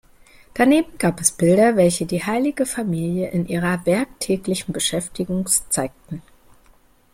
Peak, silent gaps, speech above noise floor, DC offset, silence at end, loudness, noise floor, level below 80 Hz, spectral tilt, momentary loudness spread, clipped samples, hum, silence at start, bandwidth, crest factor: -2 dBFS; none; 34 dB; under 0.1%; 0.95 s; -20 LUFS; -54 dBFS; -50 dBFS; -4.5 dB/octave; 10 LU; under 0.1%; none; 0.55 s; 16.5 kHz; 18 dB